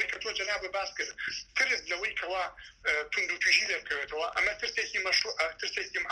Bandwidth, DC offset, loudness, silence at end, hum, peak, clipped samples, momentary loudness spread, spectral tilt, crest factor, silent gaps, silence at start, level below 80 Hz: 13.5 kHz; under 0.1%; -30 LUFS; 0 s; none; -12 dBFS; under 0.1%; 9 LU; 0.5 dB/octave; 20 dB; none; 0 s; -62 dBFS